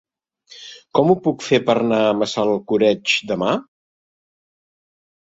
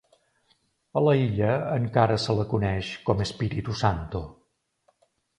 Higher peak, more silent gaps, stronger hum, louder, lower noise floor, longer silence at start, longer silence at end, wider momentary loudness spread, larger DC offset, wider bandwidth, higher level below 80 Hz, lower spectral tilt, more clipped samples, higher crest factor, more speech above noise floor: about the same, -2 dBFS vs -4 dBFS; neither; neither; first, -18 LUFS vs -26 LUFS; second, -50 dBFS vs -70 dBFS; second, 0.5 s vs 0.95 s; first, 1.6 s vs 1.05 s; about the same, 8 LU vs 9 LU; neither; second, 8 kHz vs 10.5 kHz; second, -60 dBFS vs -46 dBFS; second, -5 dB/octave vs -7 dB/octave; neither; about the same, 18 dB vs 22 dB; second, 32 dB vs 45 dB